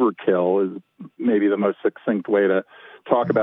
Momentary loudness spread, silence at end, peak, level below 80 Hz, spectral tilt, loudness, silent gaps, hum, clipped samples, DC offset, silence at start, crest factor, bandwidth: 7 LU; 0 s; -4 dBFS; -80 dBFS; -10.5 dB/octave; -21 LUFS; none; none; under 0.1%; under 0.1%; 0 s; 18 dB; 3.9 kHz